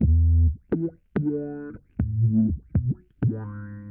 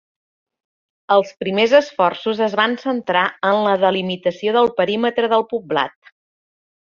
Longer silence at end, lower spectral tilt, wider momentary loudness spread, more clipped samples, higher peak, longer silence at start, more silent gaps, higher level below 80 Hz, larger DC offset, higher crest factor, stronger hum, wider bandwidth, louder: second, 0 s vs 0.95 s; first, -13 dB/octave vs -5.5 dB/octave; first, 15 LU vs 7 LU; neither; second, -12 dBFS vs -2 dBFS; second, 0 s vs 1.1 s; neither; first, -30 dBFS vs -64 dBFS; neither; second, 12 dB vs 18 dB; neither; second, 2.3 kHz vs 7.2 kHz; second, -25 LUFS vs -18 LUFS